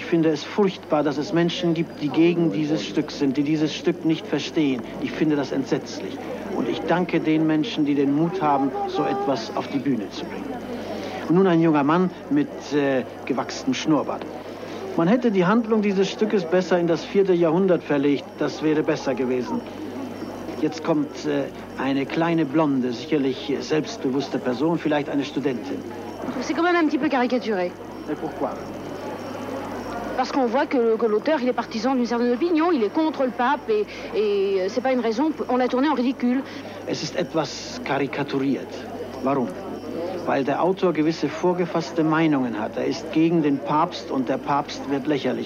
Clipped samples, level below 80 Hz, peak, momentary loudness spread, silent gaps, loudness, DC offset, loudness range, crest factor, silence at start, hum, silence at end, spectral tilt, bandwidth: under 0.1%; -58 dBFS; -8 dBFS; 11 LU; none; -23 LUFS; under 0.1%; 4 LU; 16 dB; 0 s; none; 0 s; -6 dB/octave; 8 kHz